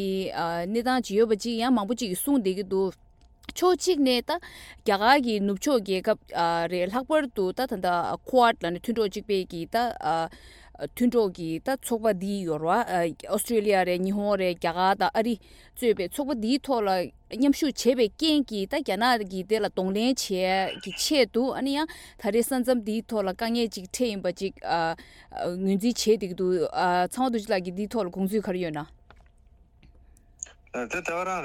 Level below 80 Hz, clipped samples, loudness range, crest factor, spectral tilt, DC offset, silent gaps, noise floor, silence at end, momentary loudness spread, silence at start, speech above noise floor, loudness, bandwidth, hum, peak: -56 dBFS; under 0.1%; 3 LU; 20 dB; -4.5 dB/octave; under 0.1%; none; -57 dBFS; 0 s; 8 LU; 0 s; 31 dB; -26 LUFS; 17.5 kHz; none; -6 dBFS